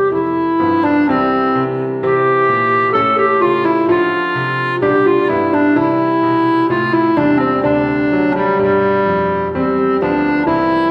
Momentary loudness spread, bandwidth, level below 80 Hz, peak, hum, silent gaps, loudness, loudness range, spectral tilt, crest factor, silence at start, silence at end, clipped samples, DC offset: 4 LU; 5.6 kHz; -46 dBFS; -2 dBFS; none; none; -14 LUFS; 1 LU; -8.5 dB/octave; 12 dB; 0 s; 0 s; under 0.1%; under 0.1%